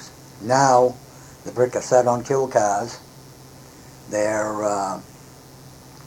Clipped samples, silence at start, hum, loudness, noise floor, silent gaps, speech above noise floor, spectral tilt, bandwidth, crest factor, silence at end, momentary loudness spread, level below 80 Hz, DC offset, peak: under 0.1%; 0 s; none; -20 LUFS; -44 dBFS; none; 24 dB; -4.5 dB/octave; 18 kHz; 20 dB; 0 s; 19 LU; -58 dBFS; under 0.1%; -2 dBFS